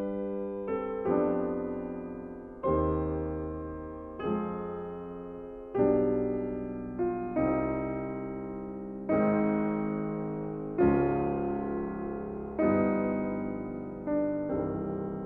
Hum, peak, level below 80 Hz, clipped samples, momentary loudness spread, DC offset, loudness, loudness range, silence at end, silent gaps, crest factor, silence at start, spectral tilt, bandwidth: none; -14 dBFS; -50 dBFS; under 0.1%; 12 LU; under 0.1%; -31 LUFS; 4 LU; 0 s; none; 16 dB; 0 s; -11.5 dB/octave; 3.8 kHz